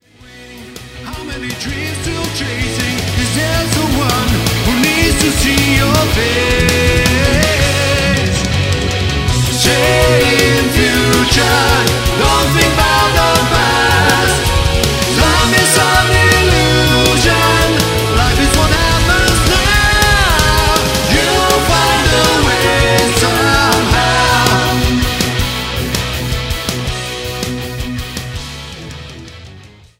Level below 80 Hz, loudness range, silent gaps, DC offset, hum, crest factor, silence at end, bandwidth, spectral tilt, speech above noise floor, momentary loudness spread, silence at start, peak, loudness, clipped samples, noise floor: -22 dBFS; 7 LU; none; under 0.1%; none; 12 dB; 0.35 s; 16.5 kHz; -3.5 dB/octave; 24 dB; 11 LU; 0.3 s; 0 dBFS; -11 LUFS; under 0.1%; -38 dBFS